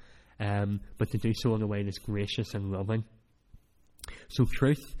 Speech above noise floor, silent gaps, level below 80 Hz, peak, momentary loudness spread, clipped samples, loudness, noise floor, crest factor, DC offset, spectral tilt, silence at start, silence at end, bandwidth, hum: 29 dB; none; -46 dBFS; -12 dBFS; 10 LU; under 0.1%; -31 LUFS; -58 dBFS; 20 dB; under 0.1%; -7 dB/octave; 0.05 s; 0 s; 15.5 kHz; none